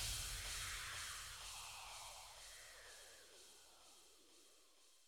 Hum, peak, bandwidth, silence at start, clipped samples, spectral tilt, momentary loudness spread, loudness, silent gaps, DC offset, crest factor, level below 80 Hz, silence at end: none; -34 dBFS; over 20 kHz; 0 s; under 0.1%; 0 dB/octave; 20 LU; -49 LUFS; none; under 0.1%; 20 dB; -62 dBFS; 0 s